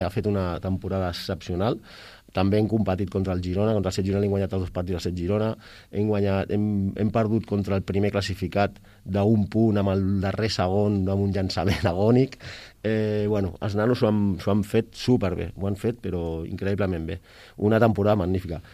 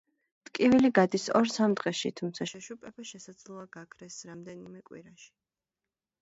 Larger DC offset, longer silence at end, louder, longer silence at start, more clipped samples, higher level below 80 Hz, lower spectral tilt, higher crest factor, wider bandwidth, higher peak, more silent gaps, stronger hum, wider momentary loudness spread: neither; second, 0.05 s vs 1.2 s; about the same, -25 LUFS vs -27 LUFS; second, 0 s vs 0.55 s; neither; first, -46 dBFS vs -70 dBFS; first, -7.5 dB/octave vs -5 dB/octave; about the same, 18 dB vs 22 dB; first, 14.5 kHz vs 8 kHz; about the same, -6 dBFS vs -8 dBFS; neither; neither; second, 8 LU vs 24 LU